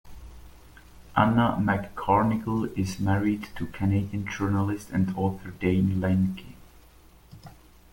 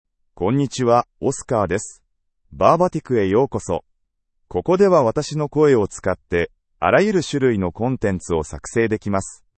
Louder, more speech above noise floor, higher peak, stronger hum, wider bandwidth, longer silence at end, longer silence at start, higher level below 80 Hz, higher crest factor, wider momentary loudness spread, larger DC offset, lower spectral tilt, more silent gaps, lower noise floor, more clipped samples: second, -26 LUFS vs -20 LUFS; second, 28 dB vs 52 dB; second, -4 dBFS vs 0 dBFS; neither; first, 17 kHz vs 8.8 kHz; first, 0.4 s vs 0.25 s; second, 0.05 s vs 0.4 s; about the same, -48 dBFS vs -48 dBFS; about the same, 22 dB vs 20 dB; second, 7 LU vs 10 LU; neither; first, -7.5 dB/octave vs -6 dB/octave; neither; second, -53 dBFS vs -70 dBFS; neither